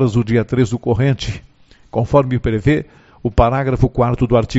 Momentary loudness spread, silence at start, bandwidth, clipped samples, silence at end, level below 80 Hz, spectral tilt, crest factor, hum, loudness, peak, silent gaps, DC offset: 10 LU; 0 s; 8 kHz; under 0.1%; 0 s; -28 dBFS; -7 dB/octave; 16 dB; none; -17 LUFS; 0 dBFS; none; under 0.1%